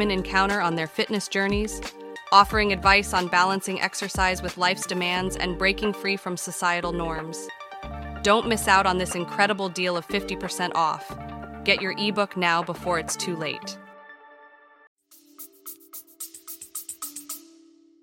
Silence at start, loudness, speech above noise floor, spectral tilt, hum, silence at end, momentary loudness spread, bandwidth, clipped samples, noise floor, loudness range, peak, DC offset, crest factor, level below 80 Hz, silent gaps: 0 s; -24 LUFS; 30 dB; -3.5 dB/octave; none; 0.6 s; 18 LU; 17 kHz; under 0.1%; -55 dBFS; 16 LU; -2 dBFS; under 0.1%; 24 dB; -44 dBFS; 14.87-14.96 s